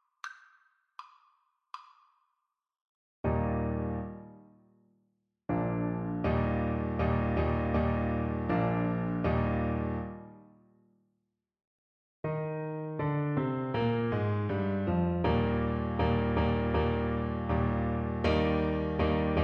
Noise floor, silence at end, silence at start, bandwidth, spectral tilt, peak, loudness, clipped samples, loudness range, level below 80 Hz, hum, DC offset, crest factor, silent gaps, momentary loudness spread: -83 dBFS; 0 s; 0.25 s; 6.6 kHz; -9.5 dB/octave; -14 dBFS; -31 LUFS; under 0.1%; 8 LU; -40 dBFS; none; under 0.1%; 18 dB; 2.81-3.24 s, 11.67-12.23 s; 13 LU